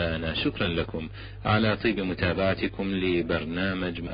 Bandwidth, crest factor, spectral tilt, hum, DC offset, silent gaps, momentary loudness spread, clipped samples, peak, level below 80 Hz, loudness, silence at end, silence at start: 5.2 kHz; 16 dB; -10.5 dB/octave; none; under 0.1%; none; 7 LU; under 0.1%; -10 dBFS; -42 dBFS; -27 LUFS; 0 s; 0 s